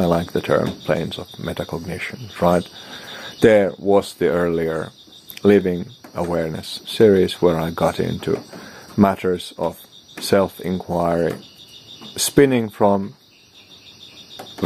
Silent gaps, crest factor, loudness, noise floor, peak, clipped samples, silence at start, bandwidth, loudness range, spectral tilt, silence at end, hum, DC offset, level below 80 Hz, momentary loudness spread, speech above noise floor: none; 20 dB; -20 LUFS; -49 dBFS; 0 dBFS; under 0.1%; 0 s; 15.5 kHz; 3 LU; -5.5 dB/octave; 0 s; none; under 0.1%; -50 dBFS; 21 LU; 30 dB